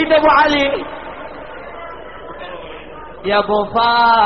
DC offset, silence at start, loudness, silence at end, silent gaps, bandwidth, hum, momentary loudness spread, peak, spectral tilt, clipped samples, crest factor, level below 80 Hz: 0.9%; 0 s; -14 LUFS; 0 s; none; 5.8 kHz; none; 21 LU; 0 dBFS; -1 dB/octave; under 0.1%; 16 dB; -44 dBFS